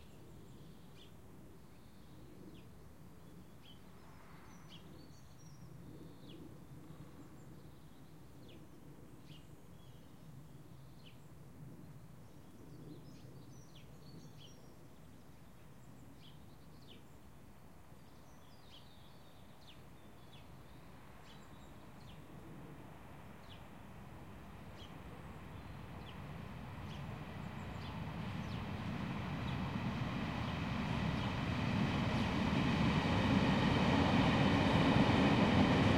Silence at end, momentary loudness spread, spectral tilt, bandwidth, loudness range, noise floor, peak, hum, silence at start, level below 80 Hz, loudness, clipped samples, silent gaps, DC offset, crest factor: 0 s; 27 LU; -6.5 dB/octave; 16.5 kHz; 25 LU; -60 dBFS; -18 dBFS; none; 0 s; -56 dBFS; -36 LUFS; under 0.1%; none; 0.1%; 22 dB